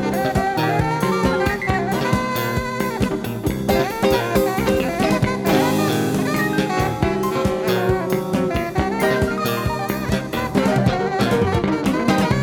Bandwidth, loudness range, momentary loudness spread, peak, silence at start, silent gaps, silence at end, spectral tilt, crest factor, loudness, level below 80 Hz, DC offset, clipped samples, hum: 18.5 kHz; 2 LU; 4 LU; -2 dBFS; 0 s; none; 0 s; -6 dB/octave; 16 dB; -20 LUFS; -36 dBFS; under 0.1%; under 0.1%; none